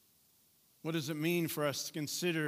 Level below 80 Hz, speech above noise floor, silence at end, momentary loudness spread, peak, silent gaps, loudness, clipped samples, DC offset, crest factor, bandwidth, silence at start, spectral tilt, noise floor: -86 dBFS; 34 dB; 0 s; 5 LU; -20 dBFS; none; -36 LUFS; under 0.1%; under 0.1%; 18 dB; 16 kHz; 0.85 s; -4.5 dB/octave; -69 dBFS